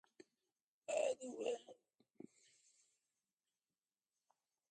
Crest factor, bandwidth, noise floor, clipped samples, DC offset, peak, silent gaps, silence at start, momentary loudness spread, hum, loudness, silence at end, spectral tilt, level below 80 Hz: 24 dB; 9.4 kHz; under -90 dBFS; under 0.1%; under 0.1%; -26 dBFS; none; 0.9 s; 22 LU; none; -44 LUFS; 2.45 s; -2.5 dB/octave; under -90 dBFS